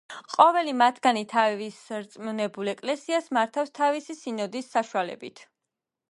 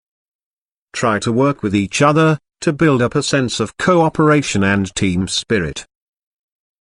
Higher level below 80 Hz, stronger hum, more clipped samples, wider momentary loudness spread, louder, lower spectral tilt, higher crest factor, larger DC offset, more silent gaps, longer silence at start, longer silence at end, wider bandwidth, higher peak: second, -80 dBFS vs -46 dBFS; neither; neither; first, 15 LU vs 7 LU; second, -26 LUFS vs -16 LUFS; about the same, -4 dB/octave vs -5 dB/octave; first, 24 dB vs 16 dB; neither; neither; second, 0.1 s vs 0.95 s; second, 0.7 s vs 0.95 s; about the same, 11.5 kHz vs 11 kHz; about the same, -2 dBFS vs 0 dBFS